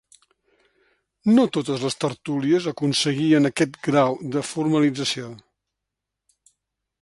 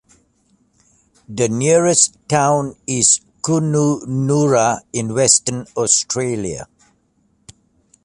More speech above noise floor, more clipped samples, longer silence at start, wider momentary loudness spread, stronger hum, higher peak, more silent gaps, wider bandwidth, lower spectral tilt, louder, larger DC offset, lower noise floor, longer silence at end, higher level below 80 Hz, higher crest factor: first, 62 dB vs 45 dB; neither; about the same, 1.25 s vs 1.3 s; about the same, 8 LU vs 10 LU; neither; second, -6 dBFS vs 0 dBFS; neither; about the same, 11.5 kHz vs 11.5 kHz; about the same, -5 dB/octave vs -4 dB/octave; second, -22 LUFS vs -16 LUFS; neither; first, -84 dBFS vs -61 dBFS; first, 1.65 s vs 1.4 s; second, -66 dBFS vs -54 dBFS; about the same, 18 dB vs 18 dB